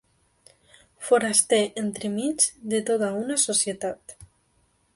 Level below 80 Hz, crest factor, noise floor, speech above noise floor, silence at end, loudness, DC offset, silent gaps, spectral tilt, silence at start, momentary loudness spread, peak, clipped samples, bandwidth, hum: -66 dBFS; 22 dB; -66 dBFS; 42 dB; 0.7 s; -23 LUFS; under 0.1%; none; -2.5 dB/octave; 1 s; 12 LU; -4 dBFS; under 0.1%; 12 kHz; none